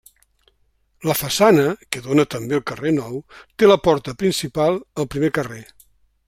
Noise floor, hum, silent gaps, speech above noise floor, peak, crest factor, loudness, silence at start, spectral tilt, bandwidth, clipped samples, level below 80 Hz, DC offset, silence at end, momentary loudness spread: -63 dBFS; none; none; 44 dB; 0 dBFS; 20 dB; -19 LUFS; 1 s; -5 dB/octave; 16 kHz; under 0.1%; -50 dBFS; under 0.1%; 0.65 s; 14 LU